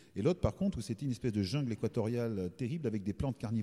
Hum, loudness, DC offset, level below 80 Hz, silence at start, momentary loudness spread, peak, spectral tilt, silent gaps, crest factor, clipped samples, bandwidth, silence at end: none; -36 LUFS; under 0.1%; -54 dBFS; 0.15 s; 5 LU; -18 dBFS; -7.5 dB/octave; none; 16 dB; under 0.1%; 13.5 kHz; 0 s